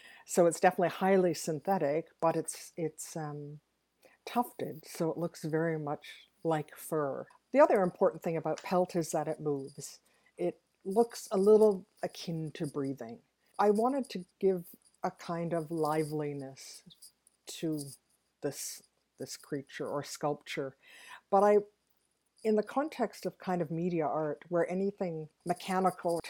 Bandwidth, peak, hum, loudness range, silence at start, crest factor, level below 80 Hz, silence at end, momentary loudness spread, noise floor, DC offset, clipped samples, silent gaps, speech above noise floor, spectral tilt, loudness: 18.5 kHz; -10 dBFS; none; 8 LU; 0.05 s; 22 dB; -78 dBFS; 0 s; 17 LU; -76 dBFS; under 0.1%; under 0.1%; none; 44 dB; -5.5 dB/octave; -32 LUFS